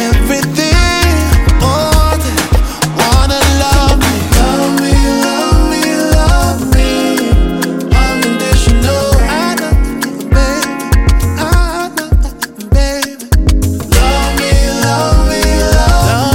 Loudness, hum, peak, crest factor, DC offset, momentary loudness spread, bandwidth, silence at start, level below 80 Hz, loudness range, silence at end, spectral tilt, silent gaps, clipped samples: -11 LUFS; none; 0 dBFS; 10 dB; under 0.1%; 5 LU; 17 kHz; 0 s; -12 dBFS; 3 LU; 0 s; -5 dB/octave; none; under 0.1%